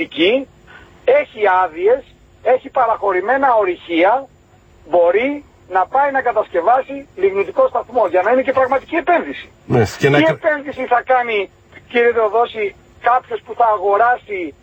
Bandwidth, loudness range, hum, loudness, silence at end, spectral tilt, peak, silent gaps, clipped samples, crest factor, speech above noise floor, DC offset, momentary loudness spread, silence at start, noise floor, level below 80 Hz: 16 kHz; 1 LU; none; -16 LUFS; 0.1 s; -6 dB/octave; 0 dBFS; none; under 0.1%; 16 dB; 33 dB; under 0.1%; 7 LU; 0 s; -48 dBFS; -52 dBFS